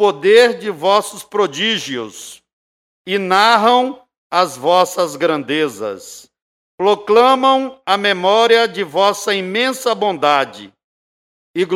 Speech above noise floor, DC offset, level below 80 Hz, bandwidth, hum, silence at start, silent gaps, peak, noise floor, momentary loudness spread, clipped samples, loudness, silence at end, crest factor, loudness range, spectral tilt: over 75 dB; under 0.1%; -68 dBFS; 16 kHz; none; 0 s; 2.53-3.05 s, 4.17-4.30 s, 6.42-6.78 s, 10.84-11.54 s; 0 dBFS; under -90 dBFS; 14 LU; under 0.1%; -15 LUFS; 0 s; 16 dB; 3 LU; -3 dB/octave